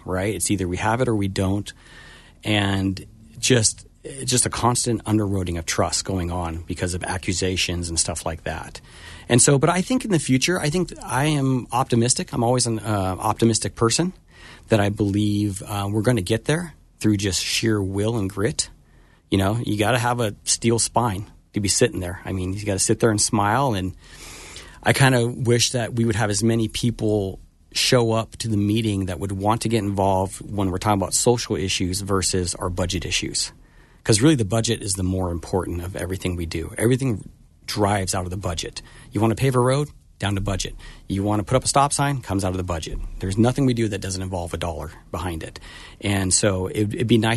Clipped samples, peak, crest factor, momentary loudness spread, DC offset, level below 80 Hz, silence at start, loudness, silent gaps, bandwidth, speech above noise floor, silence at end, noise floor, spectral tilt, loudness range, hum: under 0.1%; -4 dBFS; 20 dB; 11 LU; under 0.1%; -42 dBFS; 0.05 s; -22 LUFS; none; 12.5 kHz; 31 dB; 0 s; -53 dBFS; -4.5 dB/octave; 4 LU; none